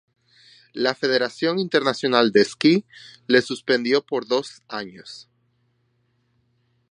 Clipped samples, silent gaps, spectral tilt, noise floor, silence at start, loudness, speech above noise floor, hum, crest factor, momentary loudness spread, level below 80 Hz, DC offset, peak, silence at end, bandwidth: under 0.1%; none; -4.5 dB/octave; -67 dBFS; 0.75 s; -21 LUFS; 46 dB; none; 22 dB; 19 LU; -70 dBFS; under 0.1%; -2 dBFS; 1.7 s; 10.5 kHz